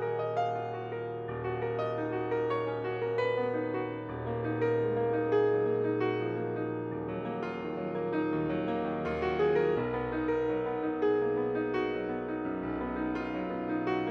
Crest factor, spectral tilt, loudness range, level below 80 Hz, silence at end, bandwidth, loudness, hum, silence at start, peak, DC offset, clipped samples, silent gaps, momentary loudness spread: 14 dB; -8.5 dB/octave; 3 LU; -56 dBFS; 0 s; 6.8 kHz; -32 LUFS; none; 0 s; -16 dBFS; under 0.1%; under 0.1%; none; 7 LU